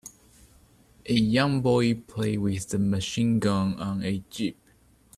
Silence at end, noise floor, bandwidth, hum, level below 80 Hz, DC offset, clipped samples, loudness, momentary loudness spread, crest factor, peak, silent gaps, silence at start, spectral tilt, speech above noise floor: 0.65 s; -60 dBFS; 14 kHz; none; -54 dBFS; under 0.1%; under 0.1%; -26 LUFS; 10 LU; 18 dB; -10 dBFS; none; 0.05 s; -6 dB/octave; 35 dB